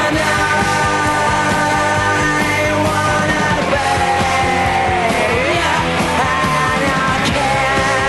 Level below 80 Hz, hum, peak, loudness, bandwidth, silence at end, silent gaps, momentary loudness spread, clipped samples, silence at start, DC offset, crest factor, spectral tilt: -34 dBFS; none; -2 dBFS; -14 LUFS; 12.5 kHz; 0 s; none; 1 LU; under 0.1%; 0 s; 0.4%; 12 dB; -4 dB/octave